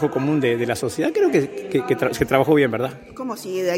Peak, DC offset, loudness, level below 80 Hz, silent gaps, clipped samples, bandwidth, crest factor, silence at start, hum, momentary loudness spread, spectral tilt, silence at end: -2 dBFS; under 0.1%; -21 LUFS; -50 dBFS; none; under 0.1%; 16.5 kHz; 18 dB; 0 s; none; 11 LU; -6 dB/octave; 0 s